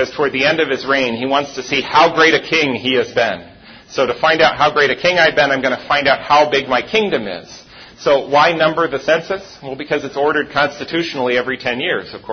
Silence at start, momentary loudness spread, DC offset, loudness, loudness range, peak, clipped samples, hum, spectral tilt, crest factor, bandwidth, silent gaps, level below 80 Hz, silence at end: 0 s; 9 LU; under 0.1%; -15 LUFS; 4 LU; 0 dBFS; under 0.1%; none; -4 dB/octave; 16 dB; 6.6 kHz; none; -52 dBFS; 0 s